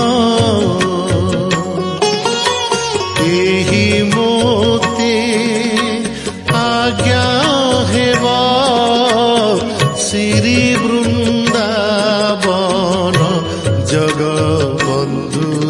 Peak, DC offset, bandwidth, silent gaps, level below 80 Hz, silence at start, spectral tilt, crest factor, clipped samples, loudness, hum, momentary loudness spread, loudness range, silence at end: 0 dBFS; under 0.1%; 11.5 kHz; none; -42 dBFS; 0 s; -4.5 dB/octave; 14 dB; under 0.1%; -13 LUFS; none; 4 LU; 2 LU; 0 s